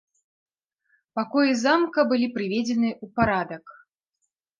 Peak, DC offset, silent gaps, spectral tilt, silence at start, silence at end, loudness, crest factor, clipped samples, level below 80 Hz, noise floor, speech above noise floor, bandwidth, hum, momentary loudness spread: -6 dBFS; under 0.1%; none; -5 dB/octave; 1.15 s; 0.85 s; -23 LUFS; 20 dB; under 0.1%; -56 dBFS; -79 dBFS; 56 dB; 7.4 kHz; none; 11 LU